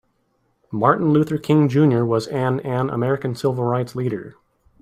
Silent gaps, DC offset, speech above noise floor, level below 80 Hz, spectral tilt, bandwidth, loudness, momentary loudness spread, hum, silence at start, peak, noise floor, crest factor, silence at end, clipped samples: none; under 0.1%; 48 dB; -58 dBFS; -8 dB/octave; 14 kHz; -20 LUFS; 9 LU; none; 0.7 s; -2 dBFS; -67 dBFS; 18 dB; 0.5 s; under 0.1%